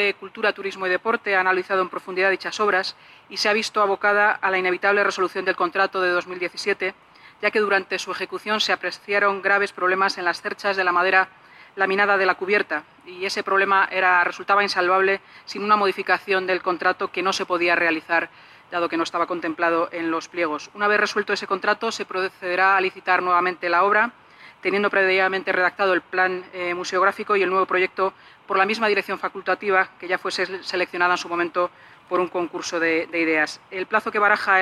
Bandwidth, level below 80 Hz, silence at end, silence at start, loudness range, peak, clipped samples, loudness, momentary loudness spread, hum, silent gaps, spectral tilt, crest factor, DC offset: 13 kHz; -70 dBFS; 0 s; 0 s; 3 LU; -4 dBFS; under 0.1%; -21 LUFS; 8 LU; none; none; -3.5 dB/octave; 18 dB; under 0.1%